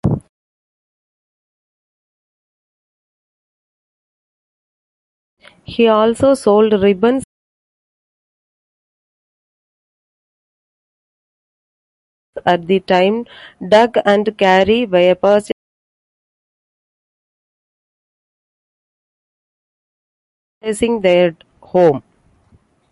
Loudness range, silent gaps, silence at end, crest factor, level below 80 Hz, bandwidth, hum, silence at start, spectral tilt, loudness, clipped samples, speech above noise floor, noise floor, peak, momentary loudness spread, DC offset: 11 LU; 0.29-5.37 s, 7.24-12.33 s, 15.52-20.61 s; 0.9 s; 18 dB; -48 dBFS; 11.5 kHz; none; 0.05 s; -6 dB/octave; -14 LUFS; under 0.1%; 41 dB; -54 dBFS; 0 dBFS; 13 LU; under 0.1%